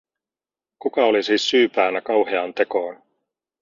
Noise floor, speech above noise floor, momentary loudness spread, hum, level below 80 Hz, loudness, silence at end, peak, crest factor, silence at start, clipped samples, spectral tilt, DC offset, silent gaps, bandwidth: under -90 dBFS; over 70 dB; 9 LU; none; -68 dBFS; -20 LUFS; 0.65 s; -4 dBFS; 18 dB; 0.85 s; under 0.1%; -3 dB/octave; under 0.1%; none; 7.6 kHz